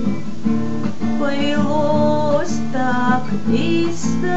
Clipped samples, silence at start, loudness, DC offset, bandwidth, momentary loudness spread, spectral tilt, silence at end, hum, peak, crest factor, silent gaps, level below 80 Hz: under 0.1%; 0 s; -19 LUFS; 10%; 8.2 kHz; 6 LU; -6 dB/octave; 0 s; none; -4 dBFS; 16 dB; none; -58 dBFS